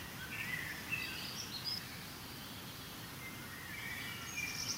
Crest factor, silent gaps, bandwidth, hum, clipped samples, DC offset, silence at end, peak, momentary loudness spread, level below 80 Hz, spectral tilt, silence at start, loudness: 20 dB; none; 16.5 kHz; none; under 0.1%; under 0.1%; 0 s; -24 dBFS; 7 LU; -64 dBFS; -2 dB/octave; 0 s; -42 LUFS